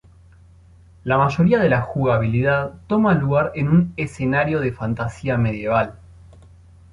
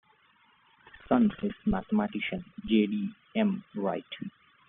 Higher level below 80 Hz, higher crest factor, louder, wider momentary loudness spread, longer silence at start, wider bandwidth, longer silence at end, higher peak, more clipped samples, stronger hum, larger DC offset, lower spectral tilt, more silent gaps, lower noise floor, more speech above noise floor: first, -44 dBFS vs -54 dBFS; about the same, 16 dB vs 20 dB; first, -20 LUFS vs -30 LUFS; second, 8 LU vs 12 LU; about the same, 1.05 s vs 0.95 s; first, 10.5 kHz vs 3.9 kHz; first, 0.95 s vs 0.4 s; first, -4 dBFS vs -10 dBFS; neither; neither; neither; first, -8.5 dB/octave vs -5.5 dB/octave; neither; second, -48 dBFS vs -64 dBFS; second, 29 dB vs 35 dB